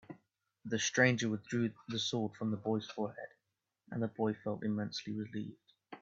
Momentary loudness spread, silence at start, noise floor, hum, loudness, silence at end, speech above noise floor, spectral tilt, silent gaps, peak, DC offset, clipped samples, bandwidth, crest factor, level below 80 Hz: 20 LU; 0.1 s; -86 dBFS; none; -36 LUFS; 0.05 s; 50 dB; -4.5 dB/octave; none; -14 dBFS; under 0.1%; under 0.1%; 7.8 kHz; 24 dB; -76 dBFS